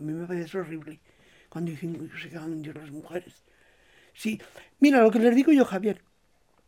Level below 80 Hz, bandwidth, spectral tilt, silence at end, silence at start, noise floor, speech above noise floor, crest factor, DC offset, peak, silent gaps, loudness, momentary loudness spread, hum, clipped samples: -70 dBFS; 15.5 kHz; -6.5 dB/octave; 0.7 s; 0 s; -67 dBFS; 42 dB; 18 dB; under 0.1%; -8 dBFS; none; -24 LUFS; 20 LU; none; under 0.1%